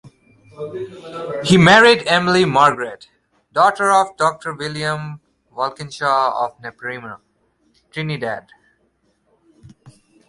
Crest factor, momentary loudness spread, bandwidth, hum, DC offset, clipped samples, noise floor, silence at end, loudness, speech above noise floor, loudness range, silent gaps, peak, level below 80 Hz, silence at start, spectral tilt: 18 dB; 20 LU; 11.5 kHz; none; under 0.1%; under 0.1%; -64 dBFS; 1.9 s; -16 LUFS; 47 dB; 16 LU; none; 0 dBFS; -54 dBFS; 0.05 s; -5 dB/octave